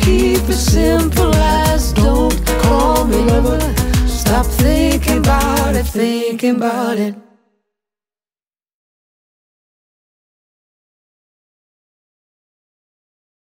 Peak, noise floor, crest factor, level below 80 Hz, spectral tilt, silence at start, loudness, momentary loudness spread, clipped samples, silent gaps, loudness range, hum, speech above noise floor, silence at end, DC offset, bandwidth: -2 dBFS; under -90 dBFS; 14 dB; -20 dBFS; -5.5 dB/octave; 0 s; -14 LUFS; 4 LU; under 0.1%; none; 9 LU; none; over 76 dB; 6.3 s; under 0.1%; 16.5 kHz